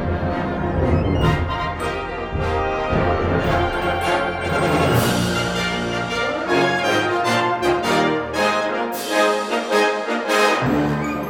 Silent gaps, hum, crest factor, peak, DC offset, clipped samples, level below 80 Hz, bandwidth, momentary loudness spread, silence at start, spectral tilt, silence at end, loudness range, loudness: none; none; 14 dB; -4 dBFS; under 0.1%; under 0.1%; -34 dBFS; 18 kHz; 6 LU; 0 s; -5 dB/octave; 0 s; 2 LU; -20 LUFS